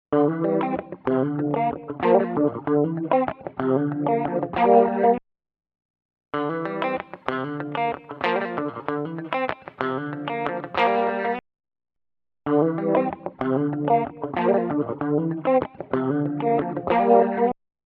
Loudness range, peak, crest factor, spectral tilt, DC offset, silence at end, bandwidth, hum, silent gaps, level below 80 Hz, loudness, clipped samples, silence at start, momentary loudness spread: 5 LU; -2 dBFS; 20 dB; -9.5 dB/octave; under 0.1%; 0.35 s; 5.6 kHz; none; 5.85-5.94 s, 6.05-6.09 s; -60 dBFS; -23 LUFS; under 0.1%; 0.1 s; 9 LU